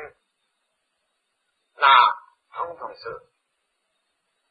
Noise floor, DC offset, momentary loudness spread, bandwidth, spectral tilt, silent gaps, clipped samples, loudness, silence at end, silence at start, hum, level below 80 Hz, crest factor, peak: -75 dBFS; under 0.1%; 23 LU; 5 kHz; -3 dB/octave; none; under 0.1%; -16 LUFS; 1.35 s; 0 s; none; -74 dBFS; 22 dB; -2 dBFS